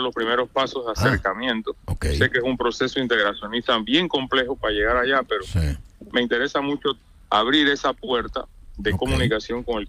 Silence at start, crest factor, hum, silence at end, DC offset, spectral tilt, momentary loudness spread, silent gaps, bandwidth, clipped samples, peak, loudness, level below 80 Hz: 0 s; 18 dB; none; 0 s; under 0.1%; -5 dB/octave; 8 LU; none; 15.5 kHz; under 0.1%; -4 dBFS; -22 LUFS; -38 dBFS